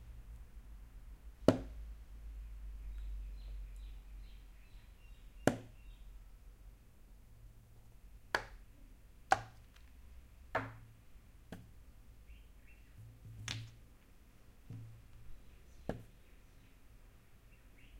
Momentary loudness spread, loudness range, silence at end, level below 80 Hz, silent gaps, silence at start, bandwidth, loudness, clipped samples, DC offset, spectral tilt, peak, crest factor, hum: 27 LU; 11 LU; 0 s; -54 dBFS; none; 0 s; 16 kHz; -42 LUFS; under 0.1%; under 0.1%; -5.5 dB/octave; -10 dBFS; 36 dB; none